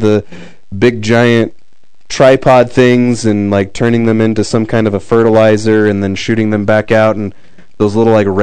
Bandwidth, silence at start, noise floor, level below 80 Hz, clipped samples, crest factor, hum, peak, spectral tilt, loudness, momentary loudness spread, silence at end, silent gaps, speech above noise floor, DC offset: 11 kHz; 0 s; -56 dBFS; -42 dBFS; 2%; 10 dB; none; 0 dBFS; -6.5 dB/octave; -10 LUFS; 7 LU; 0 s; none; 46 dB; 4%